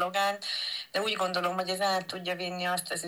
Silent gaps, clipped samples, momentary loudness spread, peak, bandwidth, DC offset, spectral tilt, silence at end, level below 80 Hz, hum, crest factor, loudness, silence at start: none; under 0.1%; 4 LU; -16 dBFS; over 20 kHz; under 0.1%; -2.5 dB/octave; 0 s; -86 dBFS; none; 16 dB; -30 LUFS; 0 s